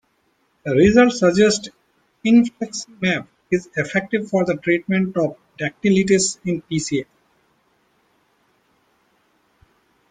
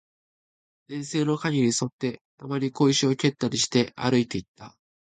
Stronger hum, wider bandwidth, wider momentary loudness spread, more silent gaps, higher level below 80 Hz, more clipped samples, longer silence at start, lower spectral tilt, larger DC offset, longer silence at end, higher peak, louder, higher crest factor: neither; about the same, 9.4 kHz vs 9.4 kHz; about the same, 12 LU vs 11 LU; second, none vs 1.92-1.99 s, 2.21-2.38 s, 4.48-4.55 s; first, -52 dBFS vs -62 dBFS; neither; second, 0.65 s vs 0.9 s; about the same, -5 dB/octave vs -4.5 dB/octave; neither; first, 3.1 s vs 0.4 s; first, -2 dBFS vs -8 dBFS; first, -19 LUFS vs -25 LUFS; about the same, 18 dB vs 18 dB